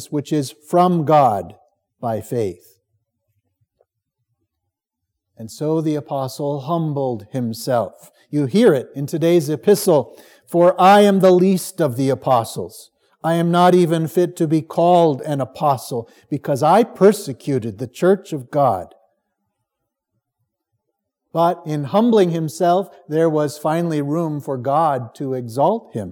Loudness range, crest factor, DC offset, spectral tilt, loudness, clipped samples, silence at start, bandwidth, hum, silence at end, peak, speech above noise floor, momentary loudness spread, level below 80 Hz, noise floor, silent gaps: 12 LU; 18 dB; under 0.1%; -6.5 dB/octave; -18 LUFS; under 0.1%; 0 s; 18.5 kHz; none; 0 s; -2 dBFS; 62 dB; 12 LU; -72 dBFS; -80 dBFS; none